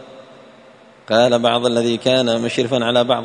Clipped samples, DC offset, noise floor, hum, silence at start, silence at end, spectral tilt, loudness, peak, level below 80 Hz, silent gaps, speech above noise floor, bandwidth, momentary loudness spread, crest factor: under 0.1%; under 0.1%; -45 dBFS; none; 0 s; 0 s; -4.5 dB/octave; -16 LUFS; -2 dBFS; -58 dBFS; none; 29 dB; 10.5 kHz; 4 LU; 16 dB